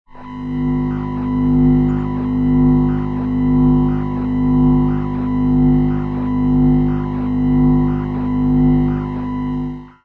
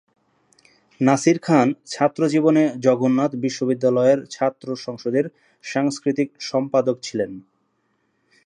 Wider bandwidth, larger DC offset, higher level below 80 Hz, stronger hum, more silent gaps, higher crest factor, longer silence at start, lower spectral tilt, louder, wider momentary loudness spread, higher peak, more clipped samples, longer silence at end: second, 4.2 kHz vs 11 kHz; neither; first, -26 dBFS vs -70 dBFS; first, 50 Hz at -25 dBFS vs none; neither; second, 10 dB vs 20 dB; second, 0.15 s vs 1 s; first, -11 dB/octave vs -6 dB/octave; first, -16 LUFS vs -21 LUFS; about the same, 8 LU vs 10 LU; second, -6 dBFS vs -2 dBFS; neither; second, 0.15 s vs 1.05 s